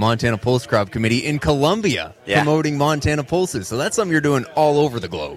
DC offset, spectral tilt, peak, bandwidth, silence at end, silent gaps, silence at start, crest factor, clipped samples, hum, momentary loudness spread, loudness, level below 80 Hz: under 0.1%; -5.5 dB/octave; -2 dBFS; 15 kHz; 0 s; none; 0 s; 16 dB; under 0.1%; none; 5 LU; -19 LUFS; -42 dBFS